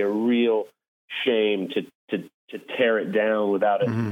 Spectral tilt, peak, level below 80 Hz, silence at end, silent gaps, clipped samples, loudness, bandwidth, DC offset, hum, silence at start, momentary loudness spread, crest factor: -7.5 dB/octave; -8 dBFS; -76 dBFS; 0 s; 0.88-1.08 s, 1.95-2.08 s, 2.34-2.48 s; under 0.1%; -24 LUFS; 10.5 kHz; under 0.1%; none; 0 s; 12 LU; 16 dB